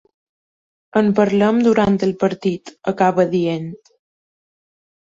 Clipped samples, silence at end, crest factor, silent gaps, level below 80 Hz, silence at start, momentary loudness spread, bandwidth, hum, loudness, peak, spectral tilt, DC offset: under 0.1%; 1.35 s; 16 dB; none; -54 dBFS; 0.95 s; 11 LU; 7.8 kHz; none; -17 LUFS; -2 dBFS; -7.5 dB/octave; under 0.1%